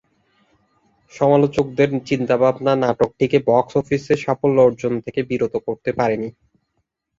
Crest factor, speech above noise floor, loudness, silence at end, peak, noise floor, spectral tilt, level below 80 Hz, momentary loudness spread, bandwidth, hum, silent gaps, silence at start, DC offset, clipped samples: 18 dB; 54 dB; -19 LUFS; 0.9 s; -2 dBFS; -72 dBFS; -7.5 dB/octave; -54 dBFS; 8 LU; 7.6 kHz; none; none; 1.15 s; under 0.1%; under 0.1%